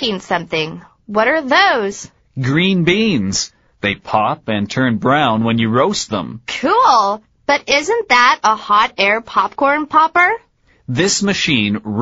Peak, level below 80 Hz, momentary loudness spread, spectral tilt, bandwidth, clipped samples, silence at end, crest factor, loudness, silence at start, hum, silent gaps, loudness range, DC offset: 0 dBFS; -50 dBFS; 11 LU; -3 dB/octave; 8 kHz; under 0.1%; 0 s; 16 dB; -15 LUFS; 0 s; none; none; 3 LU; under 0.1%